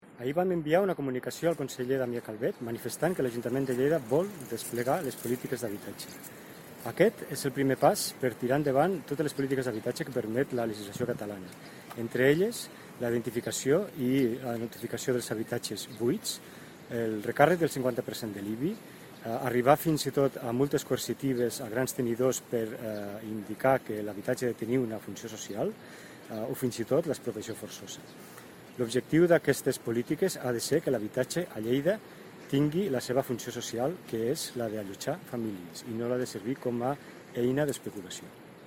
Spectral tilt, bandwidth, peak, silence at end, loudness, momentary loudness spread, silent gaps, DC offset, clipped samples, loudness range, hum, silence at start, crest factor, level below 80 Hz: -5 dB/octave; 16.5 kHz; -6 dBFS; 0 s; -31 LUFS; 15 LU; none; under 0.1%; under 0.1%; 5 LU; none; 0.05 s; 26 dB; -66 dBFS